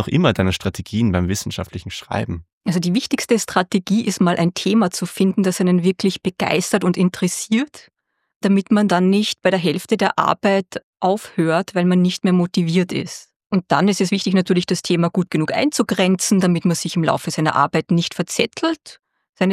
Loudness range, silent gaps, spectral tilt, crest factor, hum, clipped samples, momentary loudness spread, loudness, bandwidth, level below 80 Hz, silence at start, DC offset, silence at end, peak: 2 LU; 2.53-2.61 s, 8.36-8.41 s, 10.83-10.93 s, 13.36-13.40 s, 13.46-13.50 s, 19.29-19.33 s; -5.5 dB/octave; 18 dB; none; under 0.1%; 8 LU; -19 LUFS; 14.5 kHz; -54 dBFS; 0 s; under 0.1%; 0 s; 0 dBFS